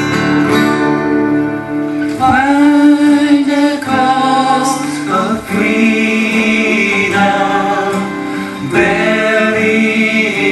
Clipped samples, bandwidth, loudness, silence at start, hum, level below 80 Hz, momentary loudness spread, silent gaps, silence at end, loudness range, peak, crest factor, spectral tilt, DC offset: under 0.1%; 12.5 kHz; -12 LUFS; 0 s; none; -46 dBFS; 7 LU; none; 0 s; 2 LU; 0 dBFS; 12 dB; -5 dB/octave; under 0.1%